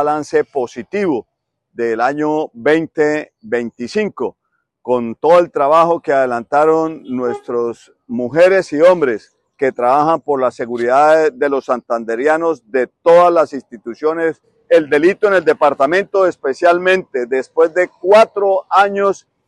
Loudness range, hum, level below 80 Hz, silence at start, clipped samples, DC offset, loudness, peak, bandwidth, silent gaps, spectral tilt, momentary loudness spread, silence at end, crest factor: 5 LU; none; -62 dBFS; 0 s; under 0.1%; under 0.1%; -15 LUFS; 0 dBFS; 11 kHz; none; -5.5 dB/octave; 10 LU; 0.35 s; 14 dB